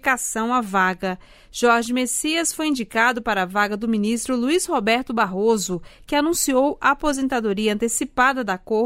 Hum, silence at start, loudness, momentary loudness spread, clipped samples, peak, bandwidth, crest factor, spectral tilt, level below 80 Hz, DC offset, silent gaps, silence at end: none; 0.05 s; -21 LUFS; 5 LU; under 0.1%; -4 dBFS; 16 kHz; 16 dB; -3 dB/octave; -48 dBFS; under 0.1%; none; 0 s